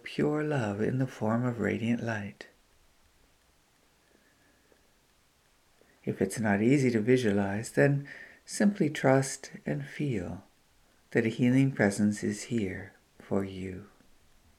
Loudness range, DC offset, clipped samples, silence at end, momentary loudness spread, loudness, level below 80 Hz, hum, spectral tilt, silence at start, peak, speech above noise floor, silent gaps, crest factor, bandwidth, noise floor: 10 LU; under 0.1%; under 0.1%; 0.7 s; 16 LU; -29 LUFS; -66 dBFS; none; -6.5 dB/octave; 0.05 s; -10 dBFS; 38 dB; none; 20 dB; 14.5 kHz; -66 dBFS